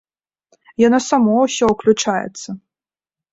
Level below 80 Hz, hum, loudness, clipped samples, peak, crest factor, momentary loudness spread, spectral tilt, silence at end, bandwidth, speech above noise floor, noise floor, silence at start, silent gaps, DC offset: -54 dBFS; none; -16 LUFS; under 0.1%; -2 dBFS; 16 dB; 18 LU; -4.5 dB/octave; 0.75 s; 8 kHz; over 74 dB; under -90 dBFS; 0.8 s; none; under 0.1%